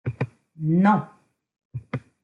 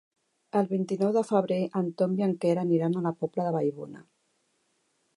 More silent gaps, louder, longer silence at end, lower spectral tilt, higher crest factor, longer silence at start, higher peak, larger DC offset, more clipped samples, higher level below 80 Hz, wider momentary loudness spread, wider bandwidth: first, 1.65-1.70 s vs none; first, -24 LUFS vs -28 LUFS; second, 0.25 s vs 1.15 s; about the same, -9.5 dB/octave vs -8.5 dB/octave; about the same, 20 dB vs 18 dB; second, 0.05 s vs 0.55 s; first, -6 dBFS vs -12 dBFS; neither; neither; first, -62 dBFS vs -80 dBFS; first, 21 LU vs 5 LU; second, 6.8 kHz vs 11 kHz